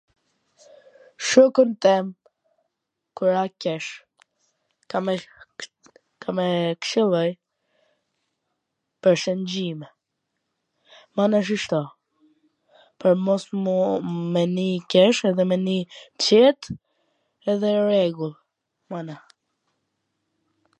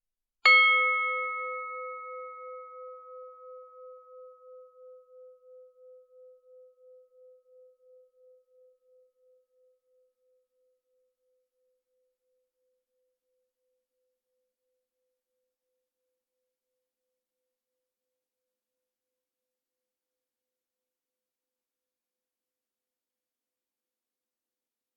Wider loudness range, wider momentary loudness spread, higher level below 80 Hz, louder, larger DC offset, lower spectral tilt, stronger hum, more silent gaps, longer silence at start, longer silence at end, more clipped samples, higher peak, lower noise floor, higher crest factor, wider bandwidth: second, 8 LU vs 29 LU; second, 20 LU vs 31 LU; first, -68 dBFS vs under -90 dBFS; about the same, -22 LUFS vs -23 LUFS; neither; first, -5.5 dB/octave vs 14 dB/octave; neither; neither; first, 1.2 s vs 0.45 s; second, 1.65 s vs 19.7 s; neither; first, -2 dBFS vs -8 dBFS; second, -80 dBFS vs under -90 dBFS; second, 22 dB vs 28 dB; first, 9.2 kHz vs 3.3 kHz